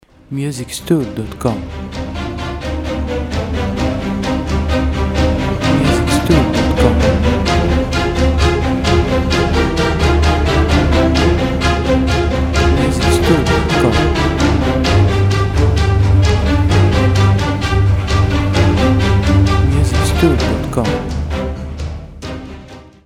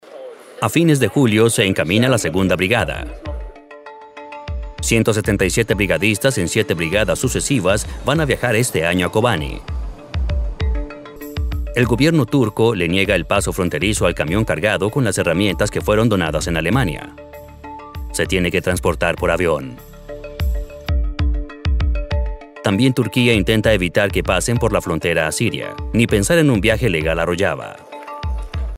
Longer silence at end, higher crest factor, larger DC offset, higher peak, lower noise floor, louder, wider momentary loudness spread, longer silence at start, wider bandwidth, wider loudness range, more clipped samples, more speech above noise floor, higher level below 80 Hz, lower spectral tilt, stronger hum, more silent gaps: first, 0.15 s vs 0 s; about the same, 14 dB vs 16 dB; neither; about the same, 0 dBFS vs -2 dBFS; about the same, -35 dBFS vs -38 dBFS; first, -14 LUFS vs -18 LUFS; second, 10 LU vs 17 LU; first, 0.3 s vs 0.05 s; second, 14.5 kHz vs 16 kHz; about the same, 6 LU vs 4 LU; neither; second, 16 dB vs 21 dB; first, -20 dBFS vs -28 dBFS; about the same, -6 dB/octave vs -5 dB/octave; neither; neither